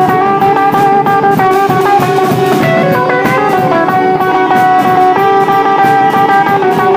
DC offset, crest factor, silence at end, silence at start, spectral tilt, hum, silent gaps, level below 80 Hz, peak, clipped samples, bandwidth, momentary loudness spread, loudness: under 0.1%; 8 dB; 0 s; 0 s; -6 dB/octave; none; none; -48 dBFS; 0 dBFS; under 0.1%; 16 kHz; 2 LU; -9 LUFS